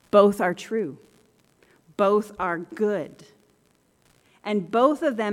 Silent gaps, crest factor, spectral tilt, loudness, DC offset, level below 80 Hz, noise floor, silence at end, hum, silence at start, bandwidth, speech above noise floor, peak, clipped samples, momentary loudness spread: none; 22 dB; -6 dB/octave; -24 LUFS; under 0.1%; -66 dBFS; -64 dBFS; 0 s; none; 0.15 s; 14.5 kHz; 41 dB; -4 dBFS; under 0.1%; 14 LU